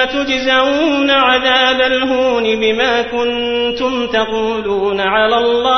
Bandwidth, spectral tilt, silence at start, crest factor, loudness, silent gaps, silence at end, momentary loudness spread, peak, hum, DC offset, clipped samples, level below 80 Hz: 6.4 kHz; -3.5 dB/octave; 0 s; 12 dB; -13 LUFS; none; 0 s; 6 LU; -2 dBFS; none; under 0.1%; under 0.1%; -44 dBFS